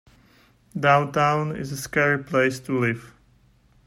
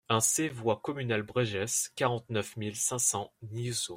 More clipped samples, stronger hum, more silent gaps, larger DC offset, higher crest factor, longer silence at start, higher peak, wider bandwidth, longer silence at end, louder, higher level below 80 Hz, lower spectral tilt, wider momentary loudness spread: neither; neither; neither; neither; about the same, 18 dB vs 20 dB; first, 0.75 s vs 0.1 s; first, -6 dBFS vs -10 dBFS; about the same, 16 kHz vs 16 kHz; first, 0.75 s vs 0 s; first, -22 LUFS vs -30 LUFS; first, -58 dBFS vs -68 dBFS; first, -5.5 dB/octave vs -3 dB/octave; about the same, 11 LU vs 9 LU